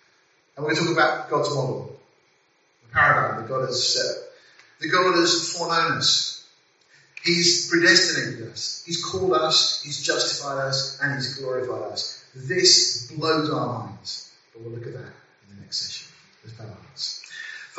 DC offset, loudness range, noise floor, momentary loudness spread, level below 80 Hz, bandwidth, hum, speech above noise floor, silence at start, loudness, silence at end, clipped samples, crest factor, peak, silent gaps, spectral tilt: under 0.1%; 10 LU; -64 dBFS; 19 LU; -64 dBFS; 8 kHz; none; 40 dB; 0.55 s; -21 LUFS; 0 s; under 0.1%; 22 dB; -2 dBFS; none; -1.5 dB/octave